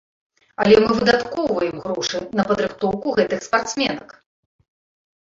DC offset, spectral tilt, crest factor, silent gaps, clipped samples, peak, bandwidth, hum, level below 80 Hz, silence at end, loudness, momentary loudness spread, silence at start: under 0.1%; -4.5 dB/octave; 20 dB; none; under 0.1%; -2 dBFS; 7.6 kHz; none; -52 dBFS; 1.15 s; -20 LUFS; 9 LU; 0.6 s